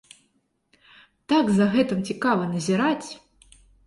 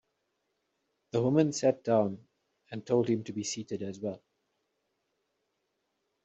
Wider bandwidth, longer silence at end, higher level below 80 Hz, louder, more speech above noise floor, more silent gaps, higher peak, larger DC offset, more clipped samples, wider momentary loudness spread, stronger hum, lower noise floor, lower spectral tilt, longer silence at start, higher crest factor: first, 11.5 kHz vs 8 kHz; second, 0.7 s vs 2.05 s; first, -60 dBFS vs -74 dBFS; first, -23 LUFS vs -30 LUFS; about the same, 48 dB vs 51 dB; neither; first, -8 dBFS vs -12 dBFS; neither; neither; second, 10 LU vs 17 LU; neither; second, -70 dBFS vs -80 dBFS; about the same, -6 dB/octave vs -7 dB/octave; first, 1.3 s vs 1.15 s; second, 16 dB vs 22 dB